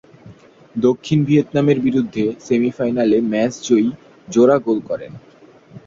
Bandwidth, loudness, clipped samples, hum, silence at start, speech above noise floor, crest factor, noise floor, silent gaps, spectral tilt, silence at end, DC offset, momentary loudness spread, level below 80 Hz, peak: 7.6 kHz; -17 LUFS; under 0.1%; none; 0.25 s; 27 dB; 16 dB; -43 dBFS; none; -7 dB/octave; 0.1 s; under 0.1%; 8 LU; -56 dBFS; -2 dBFS